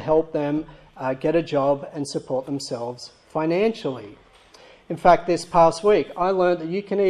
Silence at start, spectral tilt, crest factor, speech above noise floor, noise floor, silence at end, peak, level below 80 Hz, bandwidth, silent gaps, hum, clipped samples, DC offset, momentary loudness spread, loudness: 0 s; -6 dB/octave; 20 dB; 28 dB; -50 dBFS; 0 s; -2 dBFS; -52 dBFS; 12 kHz; none; none; under 0.1%; under 0.1%; 13 LU; -22 LUFS